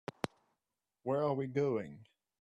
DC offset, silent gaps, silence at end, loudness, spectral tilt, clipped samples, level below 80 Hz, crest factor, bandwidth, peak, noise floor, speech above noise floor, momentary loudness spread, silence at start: under 0.1%; none; 0.4 s; -37 LUFS; -7.5 dB/octave; under 0.1%; -76 dBFS; 22 dB; 12.5 kHz; -16 dBFS; -89 dBFS; 55 dB; 11 LU; 1.05 s